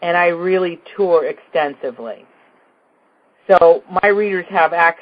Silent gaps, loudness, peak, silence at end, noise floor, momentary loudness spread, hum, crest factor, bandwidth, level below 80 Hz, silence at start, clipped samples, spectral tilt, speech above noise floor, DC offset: none; -15 LUFS; 0 dBFS; 0.05 s; -58 dBFS; 17 LU; none; 16 dB; 5 kHz; -58 dBFS; 0 s; under 0.1%; -7.5 dB/octave; 42 dB; under 0.1%